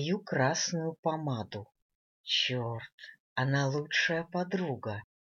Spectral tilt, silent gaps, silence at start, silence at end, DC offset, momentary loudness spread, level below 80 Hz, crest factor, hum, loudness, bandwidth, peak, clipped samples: -4 dB/octave; 0.99-1.03 s, 1.82-1.89 s, 1.95-2.24 s, 2.92-2.98 s, 3.20-3.36 s; 0 s; 0.2 s; under 0.1%; 14 LU; -74 dBFS; 18 dB; none; -32 LUFS; 7.4 kHz; -16 dBFS; under 0.1%